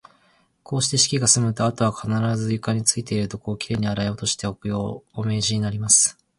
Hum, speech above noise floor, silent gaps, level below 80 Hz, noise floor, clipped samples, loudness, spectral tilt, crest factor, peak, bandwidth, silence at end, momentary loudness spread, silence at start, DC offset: none; 39 dB; none; -50 dBFS; -62 dBFS; under 0.1%; -21 LUFS; -3.5 dB/octave; 20 dB; -2 dBFS; 11.5 kHz; 0.25 s; 12 LU; 0.7 s; under 0.1%